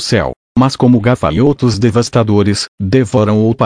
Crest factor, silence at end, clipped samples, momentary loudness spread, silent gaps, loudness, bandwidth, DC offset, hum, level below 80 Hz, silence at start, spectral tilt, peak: 12 dB; 0 s; under 0.1%; 5 LU; 0.36-0.55 s, 2.68-2.78 s; -12 LUFS; 10.5 kHz; under 0.1%; none; -36 dBFS; 0 s; -6.5 dB/octave; 0 dBFS